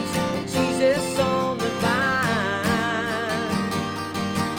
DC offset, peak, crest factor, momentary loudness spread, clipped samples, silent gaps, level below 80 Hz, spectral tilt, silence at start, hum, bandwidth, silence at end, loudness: under 0.1%; -8 dBFS; 14 dB; 5 LU; under 0.1%; none; -52 dBFS; -4.5 dB/octave; 0 s; none; over 20 kHz; 0 s; -23 LUFS